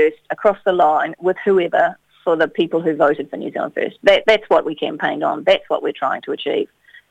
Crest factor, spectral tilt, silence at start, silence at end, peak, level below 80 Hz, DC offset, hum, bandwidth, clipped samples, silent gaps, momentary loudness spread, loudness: 18 dB; -5.5 dB/octave; 0 s; 0.45 s; 0 dBFS; -56 dBFS; under 0.1%; none; 9.2 kHz; under 0.1%; none; 9 LU; -18 LUFS